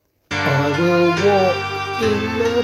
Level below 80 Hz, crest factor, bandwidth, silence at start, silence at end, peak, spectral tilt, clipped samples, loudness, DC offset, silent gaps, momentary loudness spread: -48 dBFS; 14 dB; 15.5 kHz; 0.3 s; 0 s; -4 dBFS; -5.5 dB/octave; under 0.1%; -18 LUFS; under 0.1%; none; 7 LU